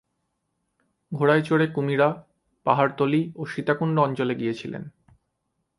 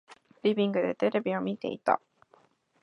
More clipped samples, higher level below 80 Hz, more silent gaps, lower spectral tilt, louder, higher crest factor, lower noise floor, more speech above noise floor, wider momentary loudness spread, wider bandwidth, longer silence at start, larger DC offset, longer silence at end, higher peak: neither; first, -68 dBFS vs -78 dBFS; neither; about the same, -8 dB/octave vs -7.5 dB/octave; first, -23 LUFS vs -29 LUFS; about the same, 22 dB vs 20 dB; first, -77 dBFS vs -64 dBFS; first, 54 dB vs 36 dB; first, 15 LU vs 5 LU; first, 11.5 kHz vs 6.6 kHz; first, 1.1 s vs 0.1 s; neither; about the same, 0.9 s vs 0.85 s; first, -4 dBFS vs -10 dBFS